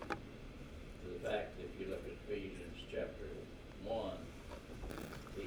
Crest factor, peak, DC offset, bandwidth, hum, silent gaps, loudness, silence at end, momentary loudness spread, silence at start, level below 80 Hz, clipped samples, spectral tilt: 22 dB; -24 dBFS; under 0.1%; over 20 kHz; none; none; -46 LUFS; 0 s; 11 LU; 0 s; -54 dBFS; under 0.1%; -5.5 dB/octave